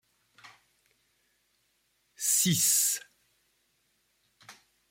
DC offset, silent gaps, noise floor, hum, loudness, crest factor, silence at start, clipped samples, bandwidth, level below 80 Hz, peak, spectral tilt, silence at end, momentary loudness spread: under 0.1%; none; -74 dBFS; none; -25 LUFS; 22 dB; 0.45 s; under 0.1%; 16.5 kHz; -76 dBFS; -12 dBFS; -1.5 dB/octave; 0.4 s; 10 LU